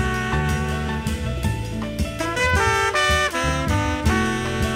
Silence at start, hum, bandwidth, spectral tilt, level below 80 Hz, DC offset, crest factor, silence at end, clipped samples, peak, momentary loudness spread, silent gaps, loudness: 0 s; none; 16 kHz; -4.5 dB/octave; -30 dBFS; under 0.1%; 16 dB; 0 s; under 0.1%; -6 dBFS; 8 LU; none; -21 LUFS